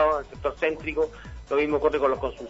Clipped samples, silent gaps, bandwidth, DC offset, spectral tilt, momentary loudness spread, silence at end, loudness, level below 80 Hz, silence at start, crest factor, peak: under 0.1%; none; 8 kHz; under 0.1%; -6.5 dB/octave; 7 LU; 0 s; -26 LUFS; -44 dBFS; 0 s; 18 dB; -8 dBFS